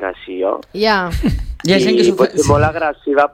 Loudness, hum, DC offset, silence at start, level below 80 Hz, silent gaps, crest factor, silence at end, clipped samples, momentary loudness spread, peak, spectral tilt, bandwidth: -15 LUFS; none; under 0.1%; 0 s; -30 dBFS; none; 14 dB; 0.05 s; under 0.1%; 8 LU; 0 dBFS; -5.5 dB/octave; 16 kHz